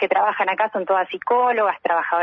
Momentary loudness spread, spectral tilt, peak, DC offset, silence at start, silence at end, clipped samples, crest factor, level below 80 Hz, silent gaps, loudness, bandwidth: 3 LU; -6 dB/octave; -6 dBFS; under 0.1%; 0 s; 0 s; under 0.1%; 14 dB; -74 dBFS; none; -20 LUFS; 5.8 kHz